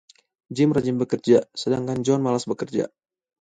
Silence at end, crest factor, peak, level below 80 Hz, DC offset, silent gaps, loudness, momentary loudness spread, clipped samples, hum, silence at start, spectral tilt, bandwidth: 0.55 s; 18 dB; -4 dBFS; -62 dBFS; under 0.1%; none; -23 LUFS; 8 LU; under 0.1%; none; 0.5 s; -6.5 dB/octave; 9.4 kHz